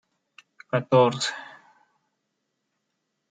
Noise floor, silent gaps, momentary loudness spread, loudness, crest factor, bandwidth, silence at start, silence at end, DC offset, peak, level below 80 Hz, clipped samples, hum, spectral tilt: -78 dBFS; none; 20 LU; -23 LUFS; 22 dB; 9.4 kHz; 0.75 s; 1.85 s; under 0.1%; -6 dBFS; -74 dBFS; under 0.1%; none; -5 dB/octave